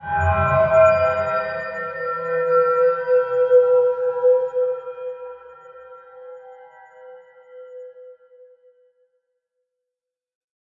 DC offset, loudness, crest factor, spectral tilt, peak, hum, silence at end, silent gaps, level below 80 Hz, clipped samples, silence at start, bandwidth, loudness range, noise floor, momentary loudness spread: under 0.1%; -19 LUFS; 18 dB; -7.5 dB/octave; -4 dBFS; none; 2.5 s; none; -52 dBFS; under 0.1%; 0 s; 7.2 kHz; 19 LU; -86 dBFS; 25 LU